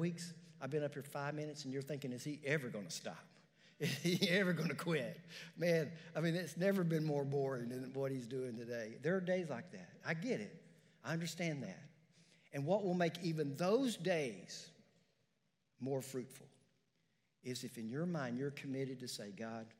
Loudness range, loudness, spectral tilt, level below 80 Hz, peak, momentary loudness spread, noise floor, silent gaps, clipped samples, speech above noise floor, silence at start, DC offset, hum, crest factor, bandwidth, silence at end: 7 LU; -41 LUFS; -5.5 dB/octave; under -90 dBFS; -22 dBFS; 14 LU; -83 dBFS; none; under 0.1%; 43 dB; 0 s; under 0.1%; none; 20 dB; 16 kHz; 0.1 s